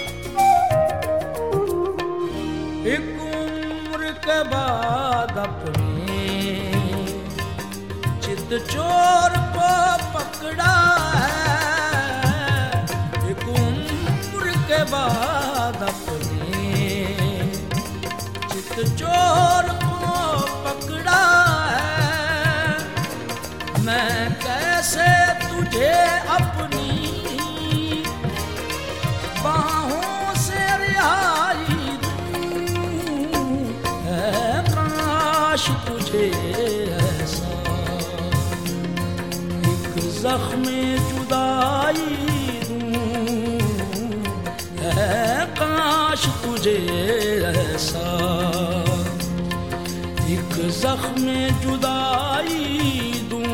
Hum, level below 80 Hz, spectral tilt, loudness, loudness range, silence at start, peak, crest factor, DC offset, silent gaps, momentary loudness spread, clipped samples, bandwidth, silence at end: none; -40 dBFS; -4.5 dB/octave; -21 LUFS; 5 LU; 0 s; -4 dBFS; 18 dB; 0.6%; none; 9 LU; under 0.1%; 17.5 kHz; 0 s